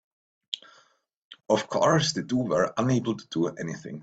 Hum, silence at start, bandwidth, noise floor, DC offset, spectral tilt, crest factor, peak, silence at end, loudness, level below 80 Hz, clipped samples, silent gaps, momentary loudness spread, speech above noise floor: none; 0.5 s; 9.2 kHz; -64 dBFS; under 0.1%; -5 dB/octave; 18 dB; -8 dBFS; 0 s; -27 LUFS; -64 dBFS; under 0.1%; 1.17-1.31 s; 14 LU; 38 dB